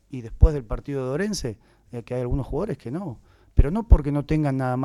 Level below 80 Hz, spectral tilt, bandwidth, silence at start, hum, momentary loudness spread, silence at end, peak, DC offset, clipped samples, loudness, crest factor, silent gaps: -26 dBFS; -7.5 dB/octave; 12 kHz; 0.1 s; none; 17 LU; 0 s; -4 dBFS; under 0.1%; under 0.1%; -25 LUFS; 20 dB; none